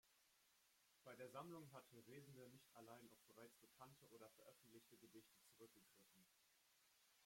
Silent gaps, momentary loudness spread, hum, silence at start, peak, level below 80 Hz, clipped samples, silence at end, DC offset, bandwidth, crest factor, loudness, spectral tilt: none; 10 LU; none; 0.05 s; -44 dBFS; under -90 dBFS; under 0.1%; 0 s; under 0.1%; 16.5 kHz; 22 dB; -65 LUFS; -4.5 dB/octave